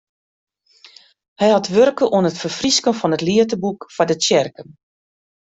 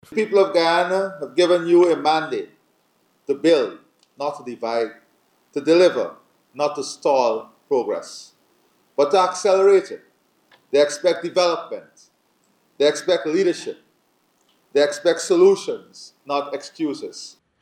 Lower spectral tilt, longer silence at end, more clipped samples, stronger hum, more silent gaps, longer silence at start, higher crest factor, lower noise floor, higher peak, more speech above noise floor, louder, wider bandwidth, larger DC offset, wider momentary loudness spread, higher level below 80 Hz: about the same, -4 dB/octave vs -4 dB/octave; first, 0.85 s vs 0.35 s; neither; neither; neither; first, 1.4 s vs 0.1 s; about the same, 16 dB vs 16 dB; second, -48 dBFS vs -64 dBFS; about the same, -2 dBFS vs -4 dBFS; second, 31 dB vs 45 dB; first, -17 LUFS vs -20 LUFS; second, 8.4 kHz vs 11 kHz; neither; second, 7 LU vs 18 LU; first, -58 dBFS vs -78 dBFS